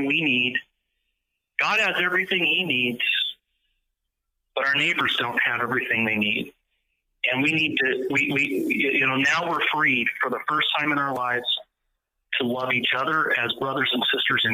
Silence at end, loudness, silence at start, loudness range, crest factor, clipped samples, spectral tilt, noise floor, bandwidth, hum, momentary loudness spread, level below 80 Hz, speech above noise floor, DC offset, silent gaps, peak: 0 s; -22 LUFS; 0 s; 2 LU; 16 dB; under 0.1%; -4 dB/octave; -80 dBFS; 16 kHz; none; 6 LU; -70 dBFS; 57 dB; under 0.1%; none; -8 dBFS